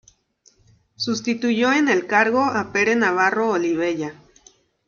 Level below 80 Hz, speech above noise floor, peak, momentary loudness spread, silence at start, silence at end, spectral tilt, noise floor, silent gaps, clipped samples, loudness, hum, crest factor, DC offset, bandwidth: -62 dBFS; 39 dB; -2 dBFS; 8 LU; 1 s; 0.75 s; -4 dB/octave; -59 dBFS; none; under 0.1%; -20 LUFS; none; 18 dB; under 0.1%; 7.2 kHz